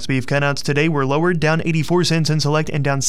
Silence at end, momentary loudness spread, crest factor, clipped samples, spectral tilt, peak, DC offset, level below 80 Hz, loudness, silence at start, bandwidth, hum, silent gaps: 0 s; 2 LU; 12 dB; under 0.1%; -5 dB/octave; -4 dBFS; 4%; -46 dBFS; -18 LUFS; 0 s; 14.5 kHz; none; none